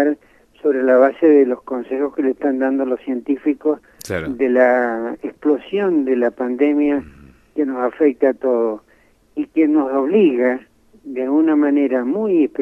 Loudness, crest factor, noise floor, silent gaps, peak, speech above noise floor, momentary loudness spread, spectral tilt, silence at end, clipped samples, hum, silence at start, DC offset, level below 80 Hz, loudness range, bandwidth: -18 LUFS; 16 dB; -51 dBFS; none; -2 dBFS; 34 dB; 11 LU; -7 dB/octave; 0 s; under 0.1%; none; 0 s; under 0.1%; -56 dBFS; 3 LU; 12 kHz